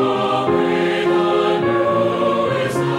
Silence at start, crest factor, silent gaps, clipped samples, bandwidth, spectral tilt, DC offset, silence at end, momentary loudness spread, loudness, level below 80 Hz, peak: 0 s; 12 dB; none; under 0.1%; 12.5 kHz; -6.5 dB/octave; under 0.1%; 0 s; 2 LU; -17 LUFS; -54 dBFS; -6 dBFS